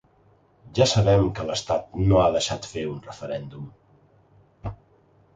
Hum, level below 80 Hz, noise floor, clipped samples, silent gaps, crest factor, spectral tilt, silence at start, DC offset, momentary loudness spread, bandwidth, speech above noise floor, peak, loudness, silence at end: none; -42 dBFS; -59 dBFS; under 0.1%; none; 20 dB; -5.5 dB/octave; 0.65 s; under 0.1%; 19 LU; 9.2 kHz; 37 dB; -6 dBFS; -23 LUFS; 0.6 s